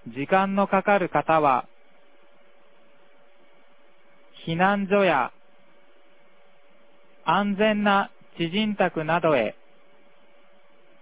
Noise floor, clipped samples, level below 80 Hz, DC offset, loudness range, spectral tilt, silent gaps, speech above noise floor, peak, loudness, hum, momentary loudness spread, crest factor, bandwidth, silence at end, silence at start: -59 dBFS; under 0.1%; -64 dBFS; 0.4%; 5 LU; -9.5 dB/octave; none; 37 dB; -4 dBFS; -23 LUFS; none; 10 LU; 20 dB; 4 kHz; 1.5 s; 0.05 s